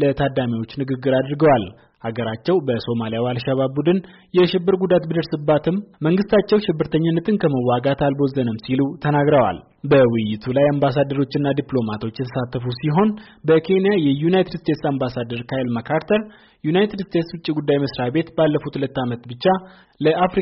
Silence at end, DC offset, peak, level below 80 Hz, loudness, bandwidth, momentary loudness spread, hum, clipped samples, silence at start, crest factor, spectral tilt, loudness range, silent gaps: 0 s; under 0.1%; -6 dBFS; -50 dBFS; -20 LUFS; 5.8 kHz; 8 LU; none; under 0.1%; 0 s; 14 dB; -6 dB/octave; 3 LU; none